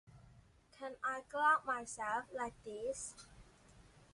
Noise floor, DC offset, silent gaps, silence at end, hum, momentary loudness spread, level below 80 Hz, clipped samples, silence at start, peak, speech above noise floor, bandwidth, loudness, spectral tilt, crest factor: -65 dBFS; under 0.1%; none; 0.25 s; none; 18 LU; -70 dBFS; under 0.1%; 0.1 s; -20 dBFS; 26 dB; 11.5 kHz; -39 LUFS; -2.5 dB/octave; 22 dB